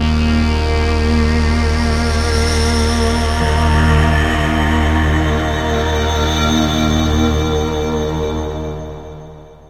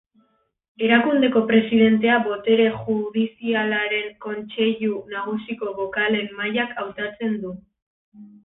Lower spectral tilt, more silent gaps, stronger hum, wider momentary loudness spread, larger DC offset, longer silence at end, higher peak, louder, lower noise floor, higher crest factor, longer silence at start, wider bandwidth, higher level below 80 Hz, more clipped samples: second, -5.5 dB/octave vs -10 dB/octave; second, none vs 7.82-8.12 s; neither; second, 7 LU vs 12 LU; neither; about the same, 0.15 s vs 0.15 s; about the same, -2 dBFS vs -4 dBFS; first, -15 LUFS vs -21 LUFS; second, -36 dBFS vs -65 dBFS; about the same, 14 dB vs 18 dB; second, 0 s vs 0.8 s; first, 14.5 kHz vs 4 kHz; first, -18 dBFS vs -62 dBFS; neither